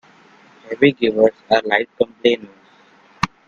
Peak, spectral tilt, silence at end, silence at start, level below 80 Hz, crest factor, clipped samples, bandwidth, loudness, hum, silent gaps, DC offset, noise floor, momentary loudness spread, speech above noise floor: 0 dBFS; -5.5 dB/octave; 0.2 s; 0.65 s; -52 dBFS; 20 dB; under 0.1%; 7.4 kHz; -18 LUFS; none; none; under 0.1%; -51 dBFS; 10 LU; 34 dB